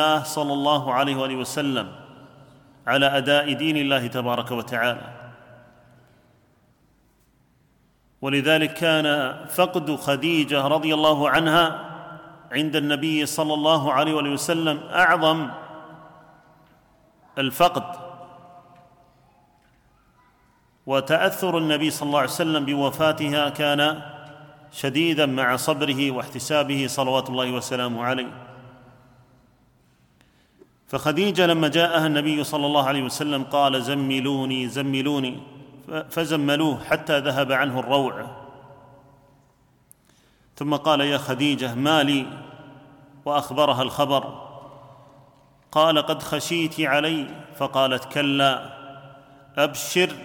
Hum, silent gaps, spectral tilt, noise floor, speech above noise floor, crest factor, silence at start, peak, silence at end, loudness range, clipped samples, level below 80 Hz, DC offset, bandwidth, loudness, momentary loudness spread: none; none; -4.5 dB/octave; -61 dBFS; 39 dB; 18 dB; 0 s; -6 dBFS; 0 s; 7 LU; under 0.1%; -64 dBFS; under 0.1%; 19 kHz; -22 LUFS; 15 LU